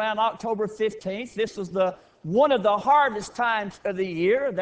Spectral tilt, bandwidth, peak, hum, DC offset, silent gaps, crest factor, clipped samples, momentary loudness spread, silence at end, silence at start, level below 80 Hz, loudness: -5.5 dB/octave; 8 kHz; -8 dBFS; none; under 0.1%; none; 16 dB; under 0.1%; 9 LU; 0 s; 0 s; -62 dBFS; -24 LUFS